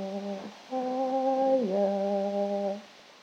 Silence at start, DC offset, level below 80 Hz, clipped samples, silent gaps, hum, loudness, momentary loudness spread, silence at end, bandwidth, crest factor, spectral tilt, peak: 0 s; under 0.1%; -88 dBFS; under 0.1%; none; none; -29 LUFS; 11 LU; 0.1 s; 8.8 kHz; 14 dB; -7 dB/octave; -16 dBFS